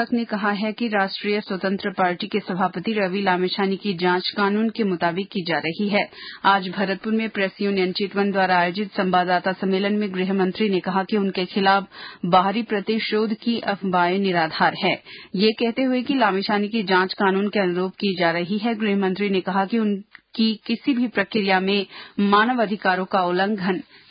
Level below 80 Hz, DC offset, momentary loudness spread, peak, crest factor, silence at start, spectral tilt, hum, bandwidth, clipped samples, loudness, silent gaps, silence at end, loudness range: -66 dBFS; under 0.1%; 5 LU; -4 dBFS; 18 dB; 0 s; -10.5 dB/octave; none; 5.2 kHz; under 0.1%; -22 LUFS; none; 0.3 s; 2 LU